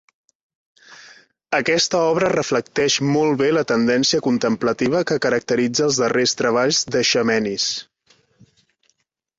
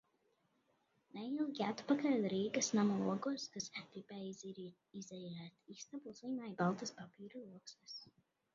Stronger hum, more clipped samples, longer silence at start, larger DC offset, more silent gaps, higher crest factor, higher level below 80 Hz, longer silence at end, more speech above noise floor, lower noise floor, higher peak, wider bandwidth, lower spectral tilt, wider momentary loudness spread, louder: neither; neither; second, 0.9 s vs 1.15 s; neither; neither; second, 16 dB vs 22 dB; first, -58 dBFS vs -84 dBFS; first, 1.55 s vs 0.45 s; first, 50 dB vs 38 dB; second, -68 dBFS vs -80 dBFS; first, -4 dBFS vs -20 dBFS; about the same, 8 kHz vs 7.4 kHz; second, -3.5 dB/octave vs -5 dB/octave; second, 4 LU vs 18 LU; first, -18 LUFS vs -40 LUFS